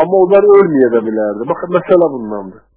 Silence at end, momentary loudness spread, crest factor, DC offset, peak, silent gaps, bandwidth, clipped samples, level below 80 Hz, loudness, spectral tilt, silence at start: 0.25 s; 14 LU; 12 dB; under 0.1%; 0 dBFS; none; 4 kHz; 0.4%; -54 dBFS; -11 LUFS; -11.5 dB/octave; 0 s